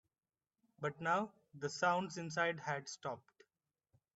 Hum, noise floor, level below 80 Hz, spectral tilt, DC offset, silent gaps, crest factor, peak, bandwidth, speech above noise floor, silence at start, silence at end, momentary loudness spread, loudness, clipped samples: none; under -90 dBFS; -84 dBFS; -4.5 dB/octave; under 0.1%; none; 20 dB; -22 dBFS; 8.2 kHz; over 50 dB; 0.8 s; 1 s; 11 LU; -40 LUFS; under 0.1%